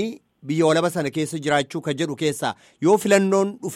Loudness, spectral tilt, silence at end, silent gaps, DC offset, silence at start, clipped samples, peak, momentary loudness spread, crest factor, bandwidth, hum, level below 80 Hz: -21 LUFS; -5 dB/octave; 0 s; none; under 0.1%; 0 s; under 0.1%; -6 dBFS; 10 LU; 16 dB; 16 kHz; none; -64 dBFS